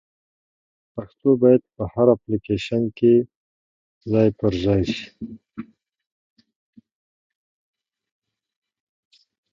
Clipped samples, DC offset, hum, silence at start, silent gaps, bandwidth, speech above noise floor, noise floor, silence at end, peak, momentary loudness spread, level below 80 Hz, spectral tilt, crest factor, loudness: under 0.1%; under 0.1%; none; 0.95 s; 3.35-4.01 s; 7.6 kHz; over 70 dB; under -90 dBFS; 3.9 s; -2 dBFS; 20 LU; -48 dBFS; -8 dB/octave; 22 dB; -20 LUFS